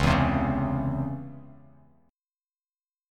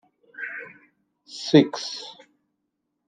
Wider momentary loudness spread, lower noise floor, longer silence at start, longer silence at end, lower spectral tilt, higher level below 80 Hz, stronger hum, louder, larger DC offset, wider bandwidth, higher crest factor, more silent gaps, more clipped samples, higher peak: second, 19 LU vs 23 LU; first, under -90 dBFS vs -78 dBFS; second, 0 s vs 0.4 s; first, 1.55 s vs 0.95 s; first, -7 dB/octave vs -5.5 dB/octave; first, -40 dBFS vs -76 dBFS; neither; second, -27 LUFS vs -23 LUFS; neither; first, 12 kHz vs 9.2 kHz; about the same, 20 dB vs 24 dB; neither; neither; second, -8 dBFS vs -4 dBFS